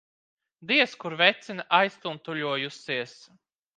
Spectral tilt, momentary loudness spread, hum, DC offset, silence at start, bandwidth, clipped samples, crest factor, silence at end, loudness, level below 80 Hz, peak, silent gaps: -4 dB/octave; 14 LU; none; under 0.1%; 0.6 s; 9.4 kHz; under 0.1%; 26 dB; 0.65 s; -25 LUFS; -82 dBFS; -2 dBFS; none